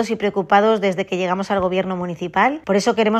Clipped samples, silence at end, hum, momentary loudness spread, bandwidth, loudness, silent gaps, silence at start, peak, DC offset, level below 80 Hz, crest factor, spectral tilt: under 0.1%; 0 s; none; 7 LU; 13 kHz; -19 LUFS; none; 0 s; -2 dBFS; under 0.1%; -54 dBFS; 16 dB; -5.5 dB/octave